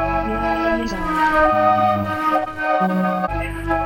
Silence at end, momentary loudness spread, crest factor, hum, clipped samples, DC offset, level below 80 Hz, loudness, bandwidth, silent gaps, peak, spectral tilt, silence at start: 0 s; 7 LU; 16 dB; none; under 0.1%; under 0.1%; -34 dBFS; -19 LUFS; 17 kHz; none; -4 dBFS; -6.5 dB/octave; 0 s